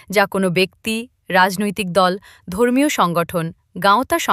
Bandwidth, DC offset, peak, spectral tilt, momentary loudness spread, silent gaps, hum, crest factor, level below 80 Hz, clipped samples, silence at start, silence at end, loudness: 15.5 kHz; under 0.1%; -2 dBFS; -4.5 dB/octave; 9 LU; none; none; 16 dB; -52 dBFS; under 0.1%; 0.1 s; 0 s; -18 LUFS